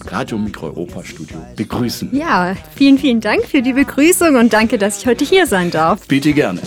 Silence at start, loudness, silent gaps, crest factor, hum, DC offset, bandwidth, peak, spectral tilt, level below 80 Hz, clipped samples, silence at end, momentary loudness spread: 0 s; -14 LUFS; none; 14 dB; none; under 0.1%; 18.5 kHz; 0 dBFS; -4.5 dB/octave; -42 dBFS; under 0.1%; 0 s; 15 LU